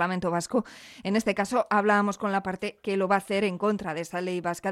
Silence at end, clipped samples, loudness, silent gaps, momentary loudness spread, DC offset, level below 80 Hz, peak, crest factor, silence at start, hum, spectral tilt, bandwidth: 0 s; under 0.1%; -27 LUFS; none; 8 LU; under 0.1%; -62 dBFS; -10 dBFS; 16 dB; 0 s; none; -5.5 dB/octave; 14 kHz